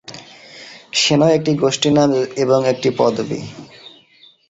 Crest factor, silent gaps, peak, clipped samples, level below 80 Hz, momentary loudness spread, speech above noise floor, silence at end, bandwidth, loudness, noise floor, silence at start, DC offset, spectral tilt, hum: 16 dB; none; -2 dBFS; under 0.1%; -56 dBFS; 22 LU; 34 dB; 0.6 s; 8.2 kHz; -16 LUFS; -50 dBFS; 0.1 s; under 0.1%; -4.5 dB/octave; none